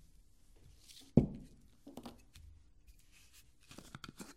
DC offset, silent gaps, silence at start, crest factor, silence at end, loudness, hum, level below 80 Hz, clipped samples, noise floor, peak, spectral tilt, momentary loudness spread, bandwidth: under 0.1%; none; 1.15 s; 30 dB; 0.05 s; -36 LUFS; none; -56 dBFS; under 0.1%; -65 dBFS; -12 dBFS; -7.5 dB/octave; 29 LU; 16 kHz